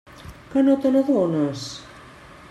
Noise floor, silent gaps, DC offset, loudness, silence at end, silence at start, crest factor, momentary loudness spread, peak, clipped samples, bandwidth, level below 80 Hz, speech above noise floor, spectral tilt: -44 dBFS; none; under 0.1%; -20 LUFS; 0.4 s; 0.15 s; 14 dB; 18 LU; -8 dBFS; under 0.1%; 12 kHz; -54 dBFS; 25 dB; -6.5 dB/octave